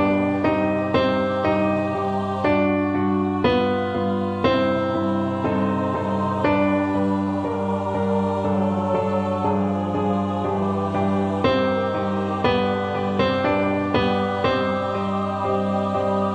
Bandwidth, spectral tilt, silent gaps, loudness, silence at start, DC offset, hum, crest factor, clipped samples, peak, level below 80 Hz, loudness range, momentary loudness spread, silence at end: 8.6 kHz; -8 dB/octave; none; -22 LUFS; 0 s; under 0.1%; none; 16 dB; under 0.1%; -6 dBFS; -50 dBFS; 1 LU; 4 LU; 0 s